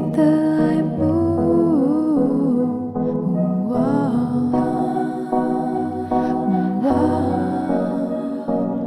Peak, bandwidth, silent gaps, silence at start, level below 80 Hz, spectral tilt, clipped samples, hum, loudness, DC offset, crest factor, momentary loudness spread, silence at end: -6 dBFS; 11 kHz; none; 0 s; -50 dBFS; -9.5 dB/octave; under 0.1%; none; -19 LUFS; under 0.1%; 14 dB; 6 LU; 0 s